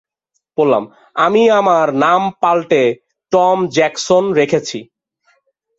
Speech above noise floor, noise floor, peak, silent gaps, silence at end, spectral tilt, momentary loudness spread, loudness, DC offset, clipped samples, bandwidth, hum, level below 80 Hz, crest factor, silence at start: 57 dB; -71 dBFS; 0 dBFS; none; 0.95 s; -5 dB/octave; 11 LU; -14 LUFS; under 0.1%; under 0.1%; 8 kHz; none; -60 dBFS; 14 dB; 0.6 s